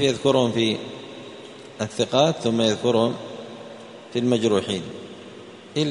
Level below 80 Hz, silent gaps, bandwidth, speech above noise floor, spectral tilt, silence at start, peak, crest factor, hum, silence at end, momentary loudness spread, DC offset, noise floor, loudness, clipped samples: -62 dBFS; none; 10.5 kHz; 20 dB; -5 dB/octave; 0 s; -4 dBFS; 20 dB; none; 0 s; 20 LU; under 0.1%; -42 dBFS; -22 LUFS; under 0.1%